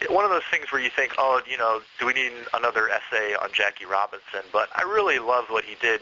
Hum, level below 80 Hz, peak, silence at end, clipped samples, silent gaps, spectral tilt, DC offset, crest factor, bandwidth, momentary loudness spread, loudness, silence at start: none; -64 dBFS; -6 dBFS; 0 s; under 0.1%; none; 1 dB/octave; under 0.1%; 20 dB; 7.6 kHz; 5 LU; -24 LUFS; 0 s